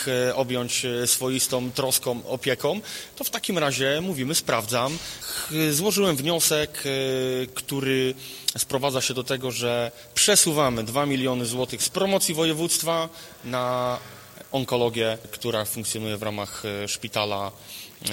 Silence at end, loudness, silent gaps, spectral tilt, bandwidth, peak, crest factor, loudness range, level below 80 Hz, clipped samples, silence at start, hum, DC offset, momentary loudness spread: 0 s; -24 LUFS; none; -3 dB/octave; 17 kHz; -4 dBFS; 22 dB; 5 LU; -58 dBFS; under 0.1%; 0 s; none; under 0.1%; 9 LU